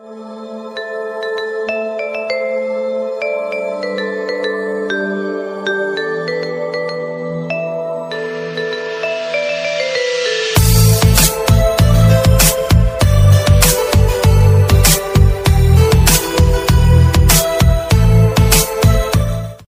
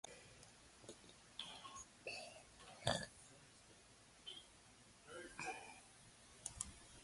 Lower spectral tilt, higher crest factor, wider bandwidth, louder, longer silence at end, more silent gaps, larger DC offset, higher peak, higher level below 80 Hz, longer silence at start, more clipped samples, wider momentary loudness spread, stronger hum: first, -4.5 dB/octave vs -2.5 dB/octave; second, 12 dB vs 32 dB; first, 16.5 kHz vs 11.5 kHz; first, -14 LUFS vs -51 LUFS; about the same, 0.05 s vs 0 s; neither; neither; first, 0 dBFS vs -22 dBFS; first, -20 dBFS vs -72 dBFS; about the same, 0.05 s vs 0.05 s; neither; second, 12 LU vs 18 LU; neither